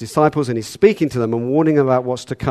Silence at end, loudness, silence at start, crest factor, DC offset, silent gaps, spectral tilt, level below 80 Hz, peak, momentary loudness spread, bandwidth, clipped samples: 0 s; -17 LUFS; 0 s; 16 dB; under 0.1%; none; -7 dB/octave; -48 dBFS; 0 dBFS; 8 LU; 13.5 kHz; under 0.1%